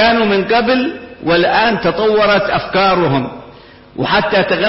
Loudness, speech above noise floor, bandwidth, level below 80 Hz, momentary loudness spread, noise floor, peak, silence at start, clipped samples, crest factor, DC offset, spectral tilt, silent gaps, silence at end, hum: -13 LUFS; 26 dB; 5.8 kHz; -42 dBFS; 11 LU; -38 dBFS; -2 dBFS; 0 s; under 0.1%; 12 dB; under 0.1%; -9.5 dB/octave; none; 0 s; none